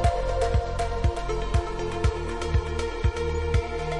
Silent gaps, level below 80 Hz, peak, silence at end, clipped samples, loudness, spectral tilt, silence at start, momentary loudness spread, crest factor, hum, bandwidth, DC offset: none; -30 dBFS; -10 dBFS; 0 s; under 0.1%; -27 LUFS; -6 dB/octave; 0 s; 4 LU; 16 dB; none; 11.5 kHz; 0.6%